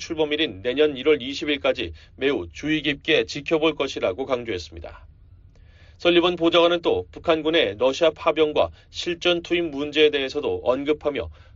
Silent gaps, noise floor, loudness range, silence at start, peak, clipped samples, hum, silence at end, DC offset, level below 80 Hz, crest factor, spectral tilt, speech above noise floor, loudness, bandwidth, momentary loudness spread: none; -49 dBFS; 4 LU; 0 s; -6 dBFS; under 0.1%; none; 0.25 s; under 0.1%; -50 dBFS; 18 dB; -2.5 dB/octave; 27 dB; -22 LUFS; 7.6 kHz; 9 LU